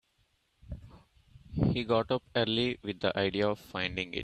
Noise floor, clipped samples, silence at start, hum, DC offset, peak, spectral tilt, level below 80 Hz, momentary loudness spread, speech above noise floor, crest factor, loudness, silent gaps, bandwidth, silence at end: -73 dBFS; under 0.1%; 0.65 s; none; under 0.1%; -14 dBFS; -6.5 dB/octave; -52 dBFS; 19 LU; 42 dB; 20 dB; -31 LUFS; none; 14 kHz; 0 s